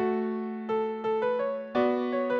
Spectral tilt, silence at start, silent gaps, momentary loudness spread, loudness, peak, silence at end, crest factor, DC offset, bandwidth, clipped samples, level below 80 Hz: -7.5 dB/octave; 0 s; none; 4 LU; -29 LUFS; -14 dBFS; 0 s; 14 dB; under 0.1%; 6.4 kHz; under 0.1%; -72 dBFS